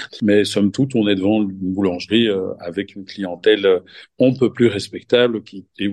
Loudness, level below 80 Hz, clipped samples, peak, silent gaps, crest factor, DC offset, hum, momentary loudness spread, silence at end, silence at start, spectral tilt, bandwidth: -18 LUFS; -60 dBFS; under 0.1%; 0 dBFS; none; 18 dB; under 0.1%; none; 11 LU; 0 s; 0 s; -6 dB/octave; 12.5 kHz